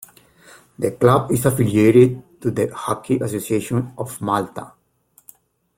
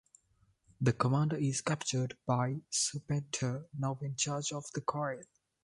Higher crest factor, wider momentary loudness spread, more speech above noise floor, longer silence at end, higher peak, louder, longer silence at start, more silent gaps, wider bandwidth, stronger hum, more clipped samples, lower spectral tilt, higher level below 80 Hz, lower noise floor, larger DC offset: about the same, 18 dB vs 20 dB; first, 13 LU vs 7 LU; about the same, 40 dB vs 38 dB; first, 1.1 s vs 0.4 s; first, -2 dBFS vs -14 dBFS; first, -19 LUFS vs -34 LUFS; about the same, 0.8 s vs 0.8 s; neither; first, 16.5 kHz vs 11.5 kHz; neither; neither; first, -7 dB/octave vs -4.5 dB/octave; first, -52 dBFS vs -66 dBFS; second, -58 dBFS vs -72 dBFS; neither